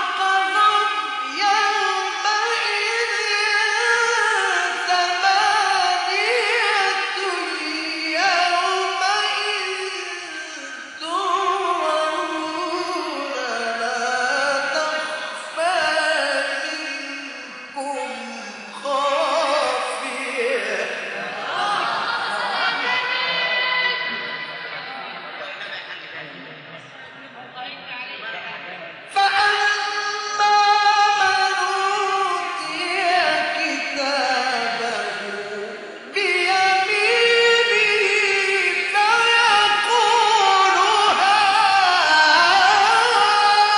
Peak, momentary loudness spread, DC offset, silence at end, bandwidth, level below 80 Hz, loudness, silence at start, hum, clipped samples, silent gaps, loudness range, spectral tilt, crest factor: -4 dBFS; 16 LU; under 0.1%; 0 s; 11.5 kHz; -72 dBFS; -18 LUFS; 0 s; none; under 0.1%; none; 9 LU; -0.5 dB/octave; 16 dB